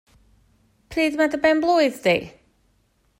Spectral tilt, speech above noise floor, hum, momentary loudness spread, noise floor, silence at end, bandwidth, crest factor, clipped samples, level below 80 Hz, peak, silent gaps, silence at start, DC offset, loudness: -5 dB/octave; 45 dB; none; 9 LU; -64 dBFS; 0.9 s; 16 kHz; 16 dB; under 0.1%; -54 dBFS; -6 dBFS; none; 0.9 s; under 0.1%; -20 LUFS